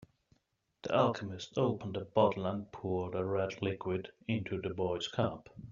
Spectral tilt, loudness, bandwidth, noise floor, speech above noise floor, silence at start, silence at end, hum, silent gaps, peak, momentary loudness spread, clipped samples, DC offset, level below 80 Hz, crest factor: -5.5 dB/octave; -35 LUFS; 7.4 kHz; -79 dBFS; 44 dB; 0.85 s; 0 s; none; none; -12 dBFS; 9 LU; under 0.1%; under 0.1%; -68 dBFS; 22 dB